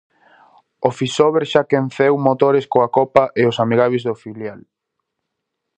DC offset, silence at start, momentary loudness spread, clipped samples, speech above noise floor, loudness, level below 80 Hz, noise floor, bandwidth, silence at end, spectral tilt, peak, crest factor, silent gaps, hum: under 0.1%; 0.8 s; 11 LU; under 0.1%; 61 dB; -16 LUFS; -60 dBFS; -78 dBFS; 9.4 kHz; 1.2 s; -6 dB/octave; 0 dBFS; 18 dB; none; none